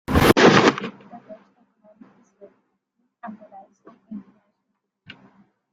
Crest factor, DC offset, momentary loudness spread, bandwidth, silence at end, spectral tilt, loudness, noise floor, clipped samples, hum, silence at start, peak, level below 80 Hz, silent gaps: 22 dB; under 0.1%; 27 LU; 16 kHz; 1.55 s; -5 dB/octave; -16 LUFS; -77 dBFS; under 0.1%; none; 0.1 s; -2 dBFS; -42 dBFS; none